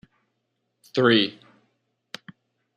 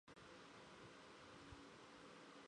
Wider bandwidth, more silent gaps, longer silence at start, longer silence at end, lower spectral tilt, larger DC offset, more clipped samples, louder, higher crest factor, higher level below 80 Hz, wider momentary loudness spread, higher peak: first, 12.5 kHz vs 10 kHz; neither; first, 0.95 s vs 0.05 s; first, 1.45 s vs 0 s; first, -6 dB/octave vs -4 dB/octave; neither; neither; first, -21 LUFS vs -61 LUFS; first, 22 dB vs 14 dB; about the same, -74 dBFS vs -78 dBFS; first, 23 LU vs 1 LU; first, -4 dBFS vs -48 dBFS